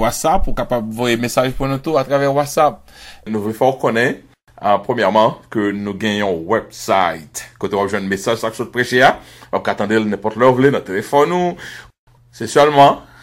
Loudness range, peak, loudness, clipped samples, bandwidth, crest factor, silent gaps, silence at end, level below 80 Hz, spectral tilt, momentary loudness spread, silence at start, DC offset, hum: 2 LU; 0 dBFS; -16 LUFS; under 0.1%; 16 kHz; 16 dB; 11.99-12.07 s; 0.2 s; -34 dBFS; -5 dB/octave; 12 LU; 0 s; under 0.1%; none